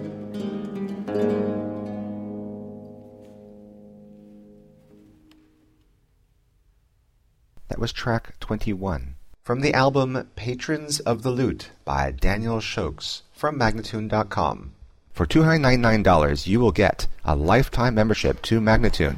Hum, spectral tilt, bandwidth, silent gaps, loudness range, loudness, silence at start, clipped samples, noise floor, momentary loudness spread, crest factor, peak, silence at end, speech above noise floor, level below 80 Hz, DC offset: none; -6 dB/octave; 15.5 kHz; none; 14 LU; -23 LUFS; 0 s; under 0.1%; -62 dBFS; 15 LU; 18 dB; -6 dBFS; 0 s; 41 dB; -34 dBFS; under 0.1%